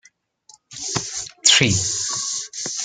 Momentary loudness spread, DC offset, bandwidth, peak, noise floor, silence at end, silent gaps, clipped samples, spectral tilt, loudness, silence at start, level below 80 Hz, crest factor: 15 LU; under 0.1%; 11 kHz; -2 dBFS; -53 dBFS; 0 s; none; under 0.1%; -1.5 dB/octave; -18 LUFS; 0.7 s; -56 dBFS; 22 dB